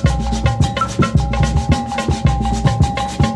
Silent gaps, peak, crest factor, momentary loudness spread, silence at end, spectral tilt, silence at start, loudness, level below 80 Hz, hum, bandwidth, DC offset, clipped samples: none; 0 dBFS; 14 dB; 2 LU; 0 s; -6 dB/octave; 0 s; -17 LUFS; -22 dBFS; none; 11.5 kHz; under 0.1%; under 0.1%